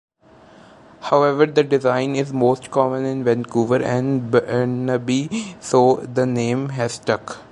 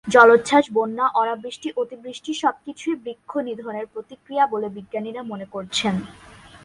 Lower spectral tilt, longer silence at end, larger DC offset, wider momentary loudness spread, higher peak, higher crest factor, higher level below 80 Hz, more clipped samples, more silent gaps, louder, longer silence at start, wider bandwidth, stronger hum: first, -6.5 dB/octave vs -4.5 dB/octave; about the same, 0.1 s vs 0.1 s; neither; second, 7 LU vs 16 LU; about the same, -2 dBFS vs 0 dBFS; about the same, 18 dB vs 22 dB; about the same, -60 dBFS vs -60 dBFS; neither; neither; first, -19 LUFS vs -22 LUFS; first, 1 s vs 0.05 s; about the same, 11.5 kHz vs 11.5 kHz; neither